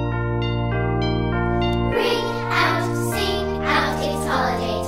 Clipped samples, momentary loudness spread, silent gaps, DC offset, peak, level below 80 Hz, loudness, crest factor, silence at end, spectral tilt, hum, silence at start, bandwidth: under 0.1%; 3 LU; none; under 0.1%; -6 dBFS; -32 dBFS; -21 LUFS; 16 dB; 0 s; -5.5 dB/octave; none; 0 s; 16 kHz